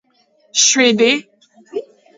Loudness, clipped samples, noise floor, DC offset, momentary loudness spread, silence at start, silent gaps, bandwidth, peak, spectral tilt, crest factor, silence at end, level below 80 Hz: -13 LUFS; under 0.1%; -57 dBFS; under 0.1%; 18 LU; 0.55 s; none; 8 kHz; 0 dBFS; -1 dB/octave; 16 dB; 0.35 s; -68 dBFS